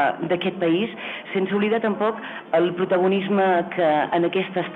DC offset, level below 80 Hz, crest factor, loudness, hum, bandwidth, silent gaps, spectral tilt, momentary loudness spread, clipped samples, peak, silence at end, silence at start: under 0.1%; -68 dBFS; 12 dB; -22 LUFS; none; 4.2 kHz; none; -8.5 dB/octave; 6 LU; under 0.1%; -8 dBFS; 0 s; 0 s